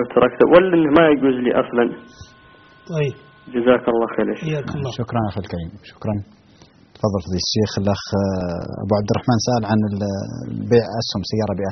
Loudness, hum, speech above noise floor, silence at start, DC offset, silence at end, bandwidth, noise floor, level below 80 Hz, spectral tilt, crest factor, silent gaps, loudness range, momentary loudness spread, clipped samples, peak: -19 LUFS; none; 31 dB; 0 s; under 0.1%; 0 s; 6.4 kHz; -49 dBFS; -50 dBFS; -5.5 dB/octave; 20 dB; none; 7 LU; 14 LU; under 0.1%; 0 dBFS